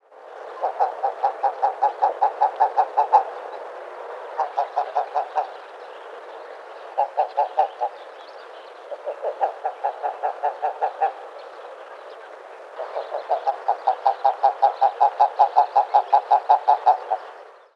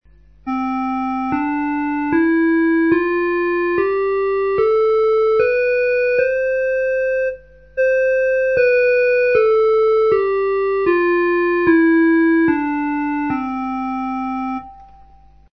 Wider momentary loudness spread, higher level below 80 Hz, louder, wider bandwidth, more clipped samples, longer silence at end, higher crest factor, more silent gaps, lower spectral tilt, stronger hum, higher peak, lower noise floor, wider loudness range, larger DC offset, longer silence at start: first, 21 LU vs 9 LU; second, under -90 dBFS vs -48 dBFS; second, -22 LUFS vs -17 LUFS; first, 6.8 kHz vs 6 kHz; neither; second, 0.25 s vs 0.7 s; first, 20 dB vs 14 dB; neither; second, -1 dB/octave vs -7.5 dB/octave; second, none vs 50 Hz at -50 dBFS; about the same, -4 dBFS vs -2 dBFS; second, -43 dBFS vs -47 dBFS; first, 10 LU vs 3 LU; second, under 0.1% vs 0.3%; second, 0.15 s vs 0.45 s